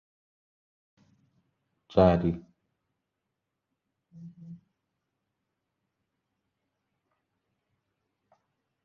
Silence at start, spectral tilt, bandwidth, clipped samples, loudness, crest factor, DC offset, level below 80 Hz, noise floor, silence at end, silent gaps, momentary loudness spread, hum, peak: 1.95 s; -7.5 dB/octave; 6.6 kHz; under 0.1%; -25 LUFS; 28 dB; under 0.1%; -52 dBFS; -84 dBFS; 4.3 s; none; 27 LU; none; -8 dBFS